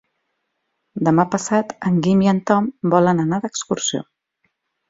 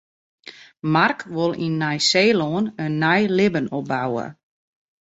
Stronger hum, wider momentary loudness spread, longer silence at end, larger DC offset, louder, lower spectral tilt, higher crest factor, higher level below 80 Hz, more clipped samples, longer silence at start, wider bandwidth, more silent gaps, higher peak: neither; about the same, 8 LU vs 9 LU; first, 0.85 s vs 0.7 s; neither; about the same, -19 LUFS vs -20 LUFS; about the same, -5.5 dB/octave vs -5 dB/octave; about the same, 18 dB vs 20 dB; about the same, -58 dBFS vs -62 dBFS; neither; first, 0.95 s vs 0.45 s; about the same, 7.8 kHz vs 8 kHz; neither; about the same, -2 dBFS vs -2 dBFS